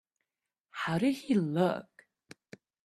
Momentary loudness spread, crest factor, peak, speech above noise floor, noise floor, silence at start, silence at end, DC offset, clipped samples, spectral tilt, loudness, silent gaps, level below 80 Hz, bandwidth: 11 LU; 20 dB; -14 dBFS; 60 dB; -89 dBFS; 0.75 s; 1 s; under 0.1%; under 0.1%; -7 dB/octave; -31 LUFS; none; -72 dBFS; 13.5 kHz